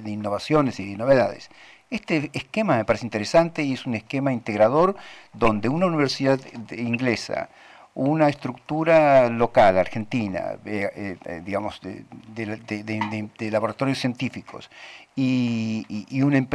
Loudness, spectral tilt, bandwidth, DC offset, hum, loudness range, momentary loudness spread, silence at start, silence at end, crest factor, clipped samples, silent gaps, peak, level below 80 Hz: -23 LUFS; -6.5 dB/octave; 11.5 kHz; under 0.1%; none; 8 LU; 16 LU; 0 s; 0 s; 14 dB; under 0.1%; none; -8 dBFS; -52 dBFS